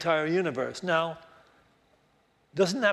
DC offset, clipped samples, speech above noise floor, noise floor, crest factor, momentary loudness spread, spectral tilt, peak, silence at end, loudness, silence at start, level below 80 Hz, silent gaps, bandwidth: under 0.1%; under 0.1%; 40 dB; -67 dBFS; 20 dB; 12 LU; -5 dB/octave; -10 dBFS; 0 s; -28 LUFS; 0 s; -70 dBFS; none; 13 kHz